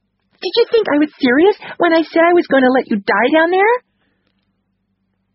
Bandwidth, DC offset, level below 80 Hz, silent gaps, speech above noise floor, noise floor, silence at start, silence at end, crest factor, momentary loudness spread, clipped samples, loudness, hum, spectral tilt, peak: 5.8 kHz; under 0.1%; -60 dBFS; none; 54 dB; -67 dBFS; 0.4 s; 1.55 s; 14 dB; 5 LU; under 0.1%; -14 LUFS; 50 Hz at -50 dBFS; -2 dB/octave; 0 dBFS